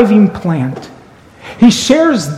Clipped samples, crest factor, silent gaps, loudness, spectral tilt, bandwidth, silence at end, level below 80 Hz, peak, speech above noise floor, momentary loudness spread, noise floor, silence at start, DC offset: 0.5%; 12 dB; none; -11 LUFS; -5.5 dB/octave; 14 kHz; 0 s; -42 dBFS; 0 dBFS; 29 dB; 16 LU; -39 dBFS; 0 s; under 0.1%